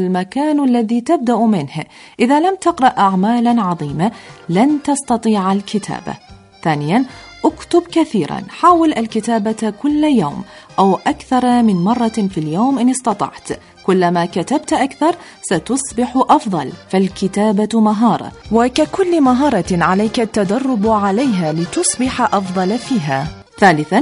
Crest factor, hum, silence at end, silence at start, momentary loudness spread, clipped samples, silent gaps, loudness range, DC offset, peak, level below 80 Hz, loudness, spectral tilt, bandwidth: 16 dB; none; 0 s; 0 s; 9 LU; under 0.1%; none; 3 LU; under 0.1%; 0 dBFS; -46 dBFS; -15 LUFS; -5.5 dB/octave; 11 kHz